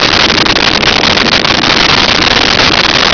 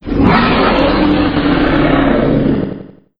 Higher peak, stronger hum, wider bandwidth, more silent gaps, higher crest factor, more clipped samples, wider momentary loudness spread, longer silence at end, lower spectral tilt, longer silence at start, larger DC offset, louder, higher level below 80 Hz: about the same, 0 dBFS vs 0 dBFS; neither; about the same, 5.4 kHz vs 5.4 kHz; neither; about the same, 8 dB vs 12 dB; neither; second, 1 LU vs 6 LU; second, 0 s vs 0.3 s; second, -2.5 dB/octave vs -9 dB/octave; about the same, 0 s vs 0.05 s; neither; first, -5 LUFS vs -12 LUFS; about the same, -28 dBFS vs -24 dBFS